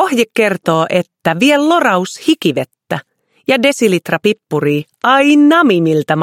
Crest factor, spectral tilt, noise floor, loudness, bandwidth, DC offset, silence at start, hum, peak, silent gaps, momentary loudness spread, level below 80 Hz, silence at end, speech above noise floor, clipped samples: 12 dB; -5 dB/octave; -38 dBFS; -12 LUFS; 16 kHz; under 0.1%; 0 s; none; 0 dBFS; none; 10 LU; -60 dBFS; 0 s; 26 dB; under 0.1%